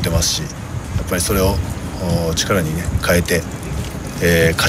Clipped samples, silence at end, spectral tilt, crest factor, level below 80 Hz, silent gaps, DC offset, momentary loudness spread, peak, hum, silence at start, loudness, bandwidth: under 0.1%; 0 s; -4 dB/octave; 16 dB; -28 dBFS; none; under 0.1%; 10 LU; -2 dBFS; none; 0 s; -18 LUFS; 16 kHz